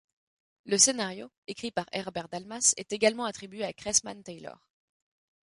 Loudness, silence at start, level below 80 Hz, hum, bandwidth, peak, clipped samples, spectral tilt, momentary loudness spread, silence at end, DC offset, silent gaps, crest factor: -27 LUFS; 0.65 s; -68 dBFS; none; 11.5 kHz; -6 dBFS; under 0.1%; -1.5 dB/octave; 21 LU; 0.95 s; under 0.1%; 1.38-1.42 s; 24 dB